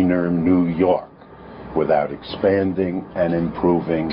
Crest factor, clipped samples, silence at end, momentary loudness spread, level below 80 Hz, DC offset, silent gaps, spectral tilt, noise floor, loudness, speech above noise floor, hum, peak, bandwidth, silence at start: 14 dB; under 0.1%; 0 s; 8 LU; -46 dBFS; under 0.1%; none; -12.5 dB/octave; -40 dBFS; -20 LUFS; 21 dB; none; -6 dBFS; 5.4 kHz; 0 s